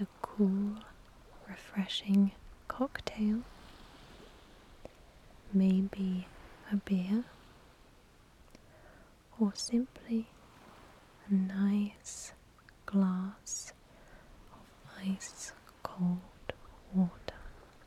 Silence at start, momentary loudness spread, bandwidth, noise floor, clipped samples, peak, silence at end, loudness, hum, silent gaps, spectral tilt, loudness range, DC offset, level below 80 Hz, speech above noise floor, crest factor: 0 s; 24 LU; 12.5 kHz; -61 dBFS; under 0.1%; -14 dBFS; 0.25 s; -34 LUFS; none; none; -6 dB/octave; 5 LU; under 0.1%; -60 dBFS; 28 dB; 22 dB